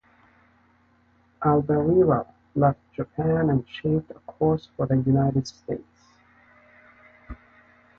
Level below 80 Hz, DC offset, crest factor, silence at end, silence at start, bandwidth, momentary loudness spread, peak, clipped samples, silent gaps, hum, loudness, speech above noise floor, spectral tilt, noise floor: -50 dBFS; under 0.1%; 18 dB; 0.65 s; 1.4 s; 7 kHz; 14 LU; -8 dBFS; under 0.1%; none; none; -24 LUFS; 39 dB; -9 dB/octave; -62 dBFS